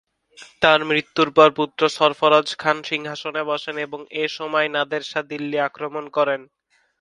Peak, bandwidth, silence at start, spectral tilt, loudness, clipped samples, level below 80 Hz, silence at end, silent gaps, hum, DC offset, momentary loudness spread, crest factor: 0 dBFS; 11.5 kHz; 0.4 s; -4 dB/octave; -20 LUFS; under 0.1%; -64 dBFS; 0.55 s; none; none; under 0.1%; 12 LU; 22 dB